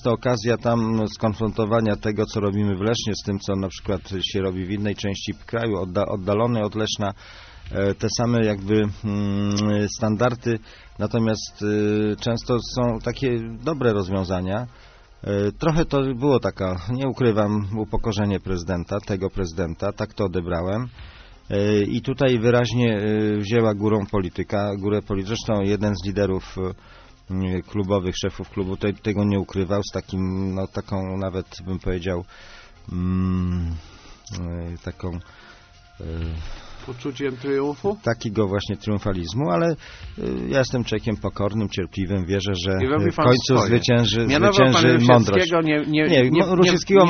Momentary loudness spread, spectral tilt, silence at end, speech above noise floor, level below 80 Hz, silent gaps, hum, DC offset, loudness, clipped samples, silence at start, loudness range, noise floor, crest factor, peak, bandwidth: 12 LU; -5.5 dB/octave; 0 s; 27 dB; -42 dBFS; none; none; under 0.1%; -22 LUFS; under 0.1%; 0 s; 9 LU; -48 dBFS; 22 dB; 0 dBFS; 6.6 kHz